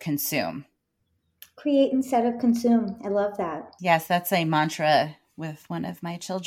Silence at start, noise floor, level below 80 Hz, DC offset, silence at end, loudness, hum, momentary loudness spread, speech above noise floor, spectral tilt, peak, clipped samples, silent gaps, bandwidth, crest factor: 0 s; -74 dBFS; -68 dBFS; under 0.1%; 0 s; -25 LUFS; none; 12 LU; 50 dB; -5 dB/octave; -8 dBFS; under 0.1%; none; 17.5 kHz; 18 dB